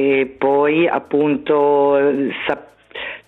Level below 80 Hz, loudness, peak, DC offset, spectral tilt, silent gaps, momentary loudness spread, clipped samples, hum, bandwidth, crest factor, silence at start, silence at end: -60 dBFS; -17 LUFS; -2 dBFS; under 0.1%; -8 dB/octave; none; 13 LU; under 0.1%; none; 4.1 kHz; 14 dB; 0 s; 0.1 s